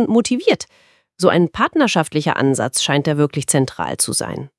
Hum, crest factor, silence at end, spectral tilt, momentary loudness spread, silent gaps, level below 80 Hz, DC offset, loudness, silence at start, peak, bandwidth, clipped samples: none; 18 dB; 0.1 s; -4.5 dB/octave; 4 LU; none; -54 dBFS; under 0.1%; -17 LUFS; 0 s; 0 dBFS; 12 kHz; under 0.1%